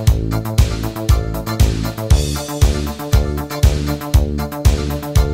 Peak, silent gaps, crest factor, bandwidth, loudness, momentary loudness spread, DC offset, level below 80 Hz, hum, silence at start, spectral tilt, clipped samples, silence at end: 0 dBFS; none; 16 dB; 16.5 kHz; -18 LUFS; 5 LU; under 0.1%; -18 dBFS; none; 0 s; -6 dB/octave; under 0.1%; 0 s